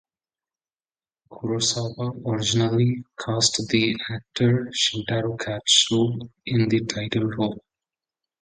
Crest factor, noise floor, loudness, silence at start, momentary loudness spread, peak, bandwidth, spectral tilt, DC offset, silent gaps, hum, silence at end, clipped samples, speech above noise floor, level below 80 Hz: 22 dB; under -90 dBFS; -23 LUFS; 1.3 s; 11 LU; -4 dBFS; 9.6 kHz; -4 dB/octave; under 0.1%; none; none; 0.8 s; under 0.1%; over 67 dB; -56 dBFS